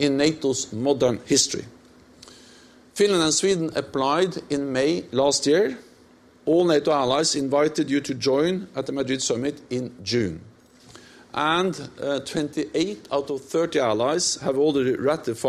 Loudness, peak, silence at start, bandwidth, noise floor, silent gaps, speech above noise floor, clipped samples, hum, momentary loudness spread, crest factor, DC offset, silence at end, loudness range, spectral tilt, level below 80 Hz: -23 LUFS; -6 dBFS; 0 s; 14 kHz; -53 dBFS; none; 31 dB; under 0.1%; none; 8 LU; 16 dB; under 0.1%; 0 s; 5 LU; -4 dB/octave; -60 dBFS